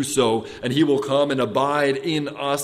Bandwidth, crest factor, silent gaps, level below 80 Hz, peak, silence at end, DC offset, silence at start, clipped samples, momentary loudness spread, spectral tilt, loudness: 15.5 kHz; 16 dB; none; -58 dBFS; -4 dBFS; 0 s; under 0.1%; 0 s; under 0.1%; 5 LU; -4.5 dB/octave; -21 LUFS